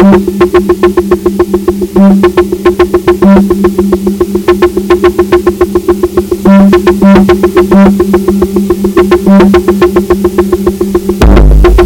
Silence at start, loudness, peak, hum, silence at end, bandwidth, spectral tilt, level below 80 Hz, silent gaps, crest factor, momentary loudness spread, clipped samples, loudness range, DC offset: 0 s; -6 LUFS; 0 dBFS; none; 0 s; 17 kHz; -7.5 dB/octave; -14 dBFS; none; 6 dB; 6 LU; 20%; 2 LU; under 0.1%